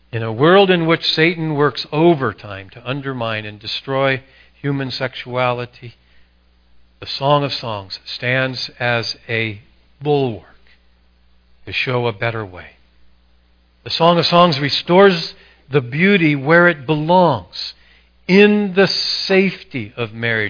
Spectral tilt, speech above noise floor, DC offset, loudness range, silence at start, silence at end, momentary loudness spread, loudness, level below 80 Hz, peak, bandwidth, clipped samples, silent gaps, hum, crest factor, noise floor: -6.5 dB/octave; 38 dB; under 0.1%; 9 LU; 0.15 s; 0 s; 15 LU; -16 LUFS; -54 dBFS; 0 dBFS; 5.4 kHz; under 0.1%; none; none; 18 dB; -54 dBFS